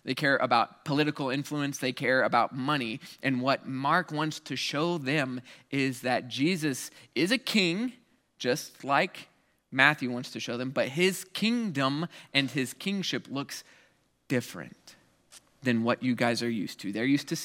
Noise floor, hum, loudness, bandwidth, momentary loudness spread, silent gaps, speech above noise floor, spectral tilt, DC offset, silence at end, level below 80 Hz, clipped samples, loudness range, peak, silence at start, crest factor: -66 dBFS; none; -29 LUFS; 16.5 kHz; 10 LU; none; 37 dB; -4.5 dB/octave; under 0.1%; 0 s; -78 dBFS; under 0.1%; 5 LU; -4 dBFS; 0.05 s; 26 dB